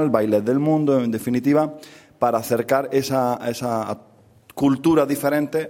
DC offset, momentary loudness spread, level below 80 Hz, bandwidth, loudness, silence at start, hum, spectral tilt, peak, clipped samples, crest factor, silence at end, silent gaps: under 0.1%; 8 LU; -58 dBFS; 16.5 kHz; -21 LUFS; 0 s; none; -6.5 dB/octave; -2 dBFS; under 0.1%; 18 dB; 0 s; none